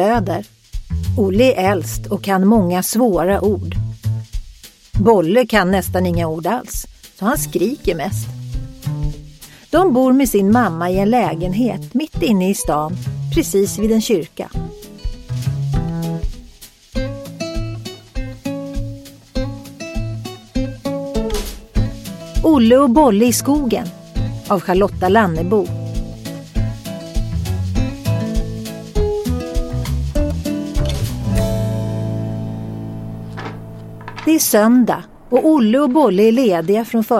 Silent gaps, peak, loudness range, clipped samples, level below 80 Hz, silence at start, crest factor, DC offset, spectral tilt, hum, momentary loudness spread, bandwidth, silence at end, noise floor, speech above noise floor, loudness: none; 0 dBFS; 10 LU; under 0.1%; -28 dBFS; 0 s; 16 dB; under 0.1%; -6 dB/octave; none; 16 LU; 16.5 kHz; 0 s; -41 dBFS; 27 dB; -17 LUFS